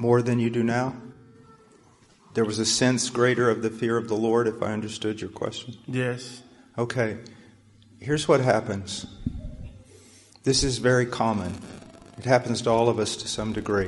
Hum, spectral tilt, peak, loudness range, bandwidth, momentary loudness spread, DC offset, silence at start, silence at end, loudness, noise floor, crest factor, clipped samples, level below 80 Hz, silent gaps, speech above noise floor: none; -4.5 dB/octave; -6 dBFS; 4 LU; 11.5 kHz; 18 LU; under 0.1%; 0 s; 0 s; -25 LUFS; -57 dBFS; 20 dB; under 0.1%; -48 dBFS; none; 32 dB